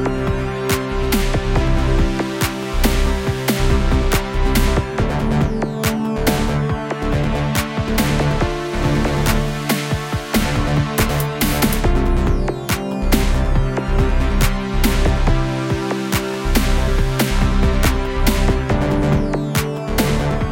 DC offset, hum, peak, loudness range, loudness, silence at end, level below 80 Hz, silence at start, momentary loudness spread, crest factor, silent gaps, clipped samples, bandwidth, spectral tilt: under 0.1%; none; 0 dBFS; 1 LU; -19 LUFS; 0 s; -20 dBFS; 0 s; 4 LU; 16 dB; none; under 0.1%; 17 kHz; -5.5 dB/octave